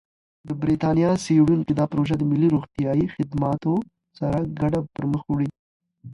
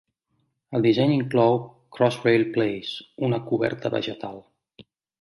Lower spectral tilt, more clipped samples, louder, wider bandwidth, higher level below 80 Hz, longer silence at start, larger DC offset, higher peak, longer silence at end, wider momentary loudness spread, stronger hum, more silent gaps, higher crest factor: about the same, -8 dB/octave vs -7.5 dB/octave; neither; about the same, -23 LUFS vs -23 LUFS; about the same, 11.5 kHz vs 11.5 kHz; first, -48 dBFS vs -66 dBFS; second, 0.45 s vs 0.7 s; neither; about the same, -8 dBFS vs -6 dBFS; second, 0 s vs 0.8 s; second, 8 LU vs 12 LU; neither; first, 5.59-5.80 s vs none; about the same, 14 dB vs 18 dB